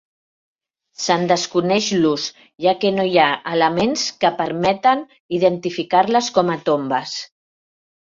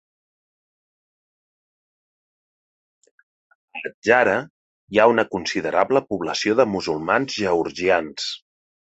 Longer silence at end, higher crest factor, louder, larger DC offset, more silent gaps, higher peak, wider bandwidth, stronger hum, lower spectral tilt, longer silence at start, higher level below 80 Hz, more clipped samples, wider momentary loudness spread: first, 0.85 s vs 0.45 s; about the same, 18 dB vs 22 dB; about the same, -18 LUFS vs -20 LUFS; neither; second, 5.20-5.29 s vs 3.94-4.02 s, 4.50-4.88 s; about the same, -2 dBFS vs -2 dBFS; about the same, 7.6 kHz vs 8.2 kHz; neither; about the same, -4 dB/octave vs -4 dB/octave; second, 1 s vs 3.75 s; about the same, -60 dBFS vs -58 dBFS; neither; second, 8 LU vs 12 LU